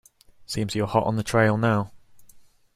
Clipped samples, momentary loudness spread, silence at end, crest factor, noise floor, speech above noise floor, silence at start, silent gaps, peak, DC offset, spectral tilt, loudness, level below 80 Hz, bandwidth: under 0.1%; 11 LU; 0.35 s; 20 dB; -51 dBFS; 29 dB; 0.4 s; none; -6 dBFS; under 0.1%; -6 dB/octave; -24 LUFS; -54 dBFS; 15 kHz